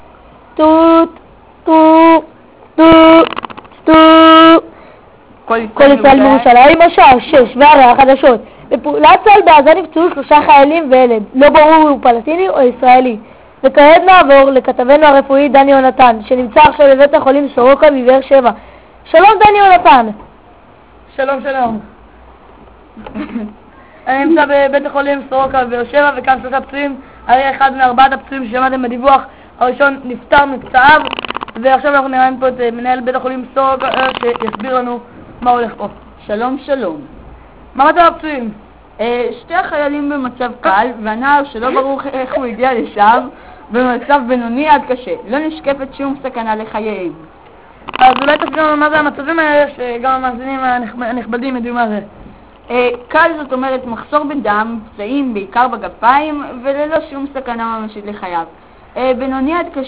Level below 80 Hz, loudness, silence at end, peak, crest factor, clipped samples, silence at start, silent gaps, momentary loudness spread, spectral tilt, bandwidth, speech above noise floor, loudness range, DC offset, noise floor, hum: -42 dBFS; -10 LUFS; 0 s; 0 dBFS; 10 dB; 2%; 0.55 s; none; 16 LU; -8.5 dB/octave; 4 kHz; 31 dB; 10 LU; 0.4%; -41 dBFS; none